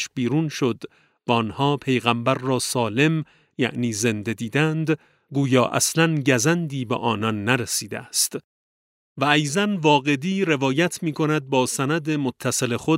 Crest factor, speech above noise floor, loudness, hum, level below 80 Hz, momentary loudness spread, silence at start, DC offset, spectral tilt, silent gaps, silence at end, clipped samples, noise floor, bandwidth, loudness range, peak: 20 dB; over 68 dB; -22 LUFS; none; -64 dBFS; 7 LU; 0 s; under 0.1%; -4.5 dB/octave; 8.44-9.16 s; 0 s; under 0.1%; under -90 dBFS; 16 kHz; 2 LU; -2 dBFS